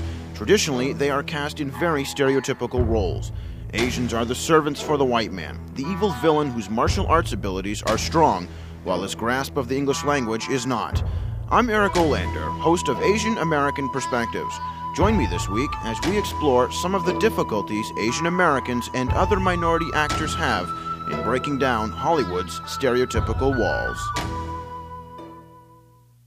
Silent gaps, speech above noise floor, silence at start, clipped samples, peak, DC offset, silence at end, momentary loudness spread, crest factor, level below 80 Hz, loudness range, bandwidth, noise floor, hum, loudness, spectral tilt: none; 31 dB; 0 s; under 0.1%; -4 dBFS; under 0.1%; 0.65 s; 10 LU; 18 dB; -36 dBFS; 2 LU; 15.5 kHz; -53 dBFS; none; -23 LUFS; -5 dB/octave